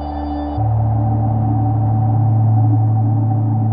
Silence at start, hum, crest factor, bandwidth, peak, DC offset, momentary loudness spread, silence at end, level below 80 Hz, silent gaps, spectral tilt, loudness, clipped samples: 0 s; none; 10 dB; 1.9 kHz; -6 dBFS; 0.7%; 5 LU; 0 s; -32 dBFS; none; -13.5 dB/octave; -16 LUFS; under 0.1%